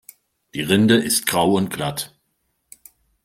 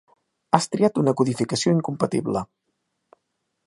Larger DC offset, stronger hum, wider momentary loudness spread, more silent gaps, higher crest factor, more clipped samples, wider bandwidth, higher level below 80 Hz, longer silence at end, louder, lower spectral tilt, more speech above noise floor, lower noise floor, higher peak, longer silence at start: neither; neither; first, 15 LU vs 7 LU; neither; about the same, 20 dB vs 24 dB; neither; first, 16.5 kHz vs 11.5 kHz; about the same, -56 dBFS vs -60 dBFS; about the same, 1.2 s vs 1.2 s; first, -19 LUFS vs -22 LUFS; second, -4 dB/octave vs -6 dB/octave; about the same, 52 dB vs 55 dB; second, -71 dBFS vs -76 dBFS; about the same, -2 dBFS vs 0 dBFS; about the same, 0.55 s vs 0.55 s